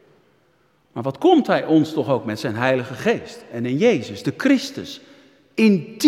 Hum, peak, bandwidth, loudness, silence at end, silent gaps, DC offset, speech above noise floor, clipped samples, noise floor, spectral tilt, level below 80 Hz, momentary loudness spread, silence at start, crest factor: none; -2 dBFS; 14.5 kHz; -20 LUFS; 0 s; none; under 0.1%; 42 dB; under 0.1%; -61 dBFS; -6 dB/octave; -66 dBFS; 14 LU; 0.95 s; 18 dB